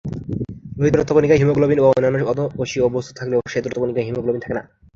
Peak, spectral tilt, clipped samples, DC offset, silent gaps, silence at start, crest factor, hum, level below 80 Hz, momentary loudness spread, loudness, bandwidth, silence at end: -2 dBFS; -7 dB/octave; under 0.1%; under 0.1%; none; 0.05 s; 16 dB; none; -44 dBFS; 13 LU; -19 LUFS; 7.6 kHz; 0.35 s